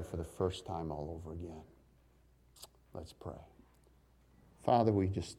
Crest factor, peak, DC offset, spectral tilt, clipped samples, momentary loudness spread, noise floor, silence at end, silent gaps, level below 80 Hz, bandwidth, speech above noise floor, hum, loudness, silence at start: 24 dB; -16 dBFS; under 0.1%; -7 dB/octave; under 0.1%; 24 LU; -67 dBFS; 0 s; none; -58 dBFS; 14.5 kHz; 31 dB; none; -36 LUFS; 0 s